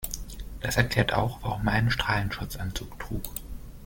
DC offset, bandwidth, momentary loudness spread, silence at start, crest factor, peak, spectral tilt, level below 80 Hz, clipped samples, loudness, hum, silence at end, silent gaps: under 0.1%; 17 kHz; 13 LU; 0 s; 24 dB; -6 dBFS; -4.5 dB/octave; -38 dBFS; under 0.1%; -28 LUFS; none; 0 s; none